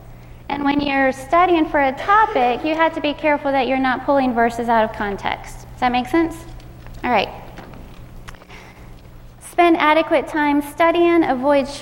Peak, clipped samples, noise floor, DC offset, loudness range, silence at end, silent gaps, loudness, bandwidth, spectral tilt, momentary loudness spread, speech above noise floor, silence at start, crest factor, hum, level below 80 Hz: -2 dBFS; under 0.1%; -40 dBFS; under 0.1%; 7 LU; 0 s; none; -18 LUFS; 16.5 kHz; -5 dB/octave; 13 LU; 23 dB; 0 s; 16 dB; none; -42 dBFS